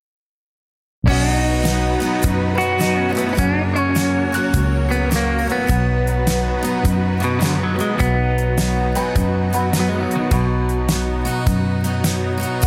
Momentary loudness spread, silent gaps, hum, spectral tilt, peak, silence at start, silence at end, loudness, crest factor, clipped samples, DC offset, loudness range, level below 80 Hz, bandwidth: 2 LU; none; none; -6 dB/octave; -4 dBFS; 1.05 s; 0 s; -19 LUFS; 14 dB; under 0.1%; under 0.1%; 1 LU; -24 dBFS; 16.5 kHz